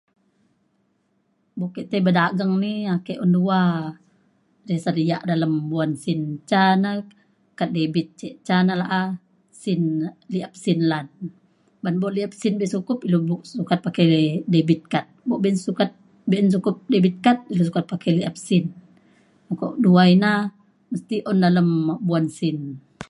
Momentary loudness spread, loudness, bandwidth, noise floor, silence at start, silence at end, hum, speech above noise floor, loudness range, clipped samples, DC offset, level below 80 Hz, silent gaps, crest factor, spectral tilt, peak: 13 LU; -21 LUFS; 11.5 kHz; -67 dBFS; 1.55 s; 0.05 s; none; 47 dB; 5 LU; under 0.1%; under 0.1%; -66 dBFS; none; 18 dB; -7 dB/octave; -2 dBFS